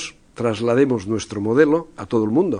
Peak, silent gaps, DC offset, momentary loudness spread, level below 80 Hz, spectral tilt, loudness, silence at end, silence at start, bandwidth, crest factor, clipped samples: -2 dBFS; none; under 0.1%; 9 LU; -54 dBFS; -6.5 dB/octave; -20 LUFS; 0 s; 0 s; 10.5 kHz; 18 dB; under 0.1%